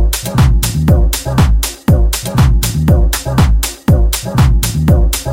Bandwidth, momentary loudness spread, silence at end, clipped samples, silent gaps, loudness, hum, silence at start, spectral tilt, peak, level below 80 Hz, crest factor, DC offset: 17 kHz; 3 LU; 0 s; under 0.1%; none; -12 LUFS; none; 0 s; -5.5 dB/octave; 0 dBFS; -14 dBFS; 10 dB; under 0.1%